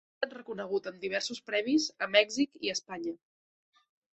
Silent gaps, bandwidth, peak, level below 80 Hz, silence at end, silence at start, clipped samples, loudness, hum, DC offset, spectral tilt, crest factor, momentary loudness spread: none; 8.4 kHz; -8 dBFS; -76 dBFS; 1 s; 0.2 s; under 0.1%; -31 LUFS; none; under 0.1%; -2.5 dB/octave; 24 dB; 13 LU